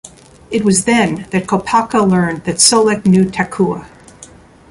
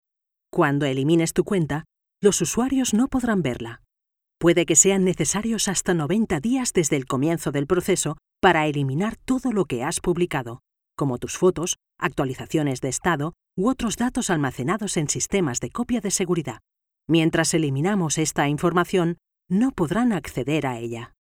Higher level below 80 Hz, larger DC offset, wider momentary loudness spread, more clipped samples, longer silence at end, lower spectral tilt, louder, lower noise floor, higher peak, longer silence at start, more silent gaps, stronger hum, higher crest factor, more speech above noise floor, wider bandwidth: about the same, -46 dBFS vs -48 dBFS; neither; about the same, 8 LU vs 8 LU; neither; first, 0.45 s vs 0.15 s; about the same, -4 dB/octave vs -4.5 dB/octave; first, -13 LUFS vs -22 LUFS; second, -40 dBFS vs -84 dBFS; first, 0 dBFS vs -4 dBFS; second, 0.05 s vs 0.55 s; neither; neither; second, 14 dB vs 20 dB; second, 27 dB vs 62 dB; second, 11.5 kHz vs 16.5 kHz